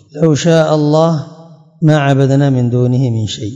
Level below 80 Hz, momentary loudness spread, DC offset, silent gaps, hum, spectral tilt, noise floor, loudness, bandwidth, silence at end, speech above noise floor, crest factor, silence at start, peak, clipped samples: -54 dBFS; 6 LU; under 0.1%; none; none; -7 dB/octave; -38 dBFS; -12 LUFS; 7.8 kHz; 0 s; 27 dB; 12 dB; 0.15 s; 0 dBFS; 0.5%